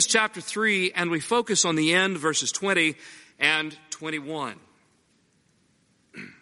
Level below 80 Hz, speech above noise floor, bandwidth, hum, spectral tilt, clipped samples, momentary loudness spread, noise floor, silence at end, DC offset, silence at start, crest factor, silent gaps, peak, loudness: -72 dBFS; 40 dB; 11.5 kHz; none; -2 dB/octave; under 0.1%; 13 LU; -66 dBFS; 0.1 s; under 0.1%; 0 s; 22 dB; none; -4 dBFS; -24 LUFS